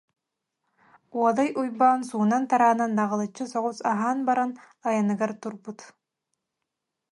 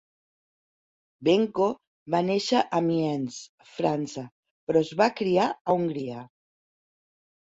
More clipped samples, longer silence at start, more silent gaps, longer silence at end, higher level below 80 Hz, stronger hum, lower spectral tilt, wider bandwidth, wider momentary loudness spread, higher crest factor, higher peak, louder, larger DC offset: neither; about the same, 1.15 s vs 1.2 s; second, none vs 1.87-2.06 s, 3.49-3.58 s, 4.32-4.43 s, 4.51-4.67 s, 5.61-5.65 s; about the same, 1.25 s vs 1.3 s; second, -78 dBFS vs -68 dBFS; neither; about the same, -6 dB/octave vs -6 dB/octave; first, 11.5 kHz vs 8 kHz; second, 14 LU vs 17 LU; about the same, 18 dB vs 20 dB; about the same, -8 dBFS vs -8 dBFS; about the same, -25 LUFS vs -26 LUFS; neither